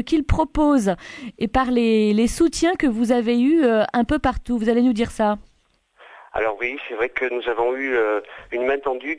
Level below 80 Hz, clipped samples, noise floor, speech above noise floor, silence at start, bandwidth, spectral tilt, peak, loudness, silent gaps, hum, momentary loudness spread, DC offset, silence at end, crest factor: -36 dBFS; under 0.1%; -62 dBFS; 42 dB; 0 s; 11 kHz; -5.5 dB/octave; -6 dBFS; -21 LUFS; none; none; 8 LU; under 0.1%; 0 s; 14 dB